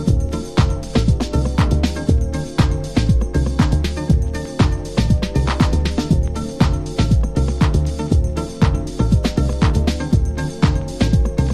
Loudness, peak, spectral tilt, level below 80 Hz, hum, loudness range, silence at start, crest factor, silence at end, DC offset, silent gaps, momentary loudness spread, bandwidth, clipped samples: -18 LUFS; 0 dBFS; -7 dB/octave; -20 dBFS; none; 0 LU; 0 s; 16 dB; 0 s; under 0.1%; none; 3 LU; 12.5 kHz; under 0.1%